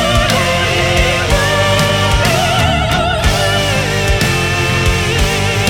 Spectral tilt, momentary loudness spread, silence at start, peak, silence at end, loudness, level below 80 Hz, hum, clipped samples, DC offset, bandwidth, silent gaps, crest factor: -4 dB/octave; 2 LU; 0 s; 0 dBFS; 0 s; -12 LUFS; -22 dBFS; none; under 0.1%; under 0.1%; 18 kHz; none; 12 dB